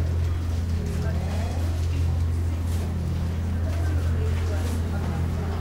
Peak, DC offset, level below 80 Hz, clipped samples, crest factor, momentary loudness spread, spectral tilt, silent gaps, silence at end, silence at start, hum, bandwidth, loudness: -14 dBFS; 0.3%; -34 dBFS; under 0.1%; 10 dB; 2 LU; -7 dB/octave; none; 0 s; 0 s; none; 13.5 kHz; -27 LUFS